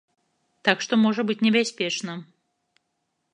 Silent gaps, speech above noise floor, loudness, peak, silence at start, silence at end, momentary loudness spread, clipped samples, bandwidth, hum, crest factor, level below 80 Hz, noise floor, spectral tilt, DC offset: none; 54 dB; -23 LUFS; -2 dBFS; 0.65 s; 1.1 s; 10 LU; under 0.1%; 10 kHz; none; 24 dB; -78 dBFS; -76 dBFS; -4 dB/octave; under 0.1%